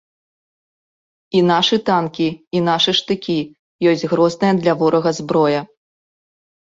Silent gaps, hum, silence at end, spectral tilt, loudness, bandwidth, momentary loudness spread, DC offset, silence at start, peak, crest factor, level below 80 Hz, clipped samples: 2.47-2.51 s, 3.59-3.79 s; none; 1 s; -5.5 dB/octave; -17 LUFS; 7.8 kHz; 7 LU; under 0.1%; 1.35 s; -2 dBFS; 16 dB; -58 dBFS; under 0.1%